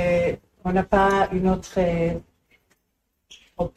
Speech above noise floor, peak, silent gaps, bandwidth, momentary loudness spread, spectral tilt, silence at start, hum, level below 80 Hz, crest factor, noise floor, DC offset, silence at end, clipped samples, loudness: 53 dB; -4 dBFS; none; 13 kHz; 12 LU; -7 dB/octave; 0 s; none; -42 dBFS; 18 dB; -74 dBFS; under 0.1%; 0.1 s; under 0.1%; -22 LUFS